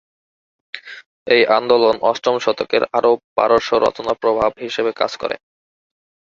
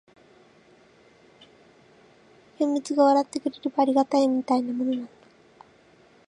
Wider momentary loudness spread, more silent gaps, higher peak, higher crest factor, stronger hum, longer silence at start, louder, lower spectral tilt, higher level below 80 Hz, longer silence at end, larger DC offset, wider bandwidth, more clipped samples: first, 19 LU vs 10 LU; first, 1.06-1.26 s, 3.24-3.36 s vs none; first, 0 dBFS vs -8 dBFS; about the same, 18 dB vs 20 dB; neither; second, 0.75 s vs 2.6 s; first, -17 LUFS vs -24 LUFS; about the same, -4 dB/octave vs -4.5 dB/octave; first, -54 dBFS vs -76 dBFS; second, 0.95 s vs 1.25 s; neither; second, 7.4 kHz vs 10.5 kHz; neither